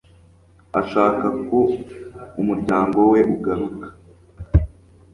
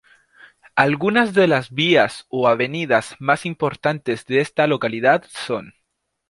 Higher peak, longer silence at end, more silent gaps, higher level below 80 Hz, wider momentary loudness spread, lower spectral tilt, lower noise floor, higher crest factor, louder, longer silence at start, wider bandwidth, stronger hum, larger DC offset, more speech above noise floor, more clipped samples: about the same, -2 dBFS vs -2 dBFS; second, 0.45 s vs 0.6 s; neither; first, -32 dBFS vs -62 dBFS; first, 19 LU vs 9 LU; first, -9.5 dB/octave vs -5.5 dB/octave; second, -51 dBFS vs -75 dBFS; about the same, 18 dB vs 18 dB; about the same, -20 LUFS vs -19 LUFS; about the same, 0.75 s vs 0.75 s; about the same, 11 kHz vs 11.5 kHz; neither; neither; second, 33 dB vs 56 dB; neither